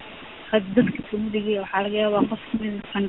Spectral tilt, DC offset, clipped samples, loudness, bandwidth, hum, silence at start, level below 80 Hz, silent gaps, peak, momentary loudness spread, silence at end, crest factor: -4.5 dB/octave; under 0.1%; under 0.1%; -24 LUFS; 4.1 kHz; none; 0 s; -52 dBFS; none; -4 dBFS; 7 LU; 0 s; 20 dB